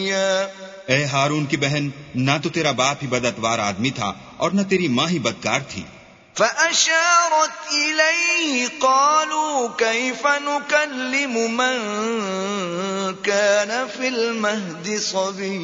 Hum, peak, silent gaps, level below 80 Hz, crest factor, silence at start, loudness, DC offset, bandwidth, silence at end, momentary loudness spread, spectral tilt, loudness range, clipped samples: none; -2 dBFS; none; -60 dBFS; 20 dB; 0 s; -20 LUFS; under 0.1%; 7.8 kHz; 0 s; 9 LU; -3 dB/octave; 5 LU; under 0.1%